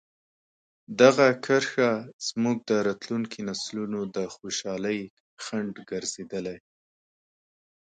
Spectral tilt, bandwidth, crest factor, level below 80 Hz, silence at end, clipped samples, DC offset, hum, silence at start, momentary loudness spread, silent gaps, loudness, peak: -4 dB/octave; 9.4 kHz; 24 dB; -70 dBFS; 1.35 s; under 0.1%; under 0.1%; none; 0.9 s; 14 LU; 2.13-2.19 s, 5.10-5.37 s; -26 LUFS; -4 dBFS